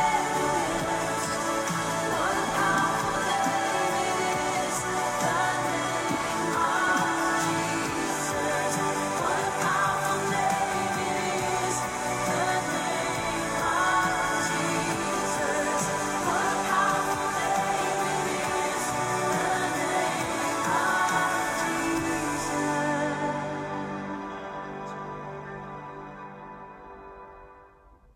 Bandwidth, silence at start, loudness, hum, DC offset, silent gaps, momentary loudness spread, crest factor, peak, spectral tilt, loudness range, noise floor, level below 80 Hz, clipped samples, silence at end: 16 kHz; 0 s; -27 LUFS; none; under 0.1%; none; 12 LU; 16 dB; -12 dBFS; -3 dB/octave; 6 LU; -55 dBFS; -54 dBFS; under 0.1%; 0.5 s